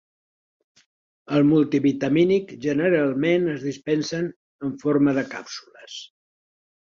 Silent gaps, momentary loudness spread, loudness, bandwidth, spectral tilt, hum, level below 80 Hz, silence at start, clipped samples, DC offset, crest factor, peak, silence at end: 4.36-4.59 s; 18 LU; -22 LUFS; 7.4 kHz; -6.5 dB/octave; none; -64 dBFS; 1.3 s; under 0.1%; under 0.1%; 16 dB; -8 dBFS; 0.8 s